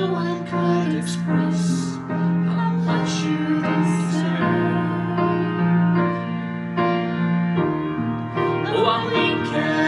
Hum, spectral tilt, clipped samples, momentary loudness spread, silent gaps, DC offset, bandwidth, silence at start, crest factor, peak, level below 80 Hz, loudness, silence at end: none; -6.5 dB/octave; under 0.1%; 5 LU; none; under 0.1%; 11.5 kHz; 0 s; 16 dB; -4 dBFS; -54 dBFS; -21 LUFS; 0 s